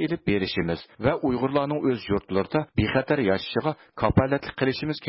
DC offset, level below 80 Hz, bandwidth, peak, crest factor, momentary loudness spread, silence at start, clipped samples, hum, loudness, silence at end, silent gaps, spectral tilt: under 0.1%; -44 dBFS; 5.8 kHz; -10 dBFS; 16 dB; 4 LU; 0 s; under 0.1%; none; -25 LUFS; 0 s; none; -11 dB/octave